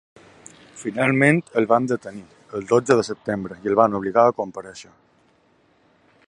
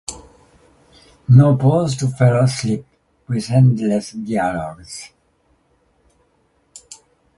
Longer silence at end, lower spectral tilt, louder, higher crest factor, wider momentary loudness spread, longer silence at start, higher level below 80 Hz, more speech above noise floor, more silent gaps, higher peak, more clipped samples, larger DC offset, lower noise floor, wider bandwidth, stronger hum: first, 1.45 s vs 0.45 s; about the same, -6.5 dB/octave vs -7 dB/octave; second, -20 LUFS vs -16 LUFS; about the same, 20 dB vs 18 dB; second, 18 LU vs 21 LU; first, 0.75 s vs 0.1 s; second, -62 dBFS vs -50 dBFS; second, 40 dB vs 46 dB; neither; about the same, -2 dBFS vs 0 dBFS; neither; neither; about the same, -60 dBFS vs -61 dBFS; about the same, 11.5 kHz vs 11.5 kHz; neither